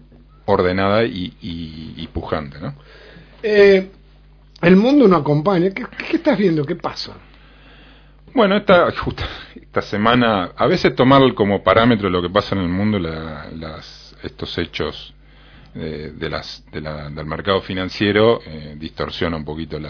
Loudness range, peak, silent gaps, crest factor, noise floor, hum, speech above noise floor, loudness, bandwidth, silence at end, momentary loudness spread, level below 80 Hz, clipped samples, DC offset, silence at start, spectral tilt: 11 LU; 0 dBFS; none; 18 dB; -47 dBFS; none; 29 dB; -17 LUFS; 5.4 kHz; 0 s; 19 LU; -42 dBFS; under 0.1%; under 0.1%; 0.5 s; -7.5 dB/octave